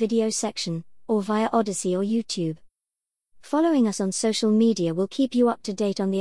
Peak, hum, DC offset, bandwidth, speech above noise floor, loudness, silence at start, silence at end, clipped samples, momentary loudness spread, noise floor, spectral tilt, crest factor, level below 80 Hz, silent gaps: -8 dBFS; none; 0.2%; 12 kHz; 65 dB; -24 LUFS; 0 s; 0 s; under 0.1%; 8 LU; -88 dBFS; -5 dB/octave; 16 dB; -66 dBFS; none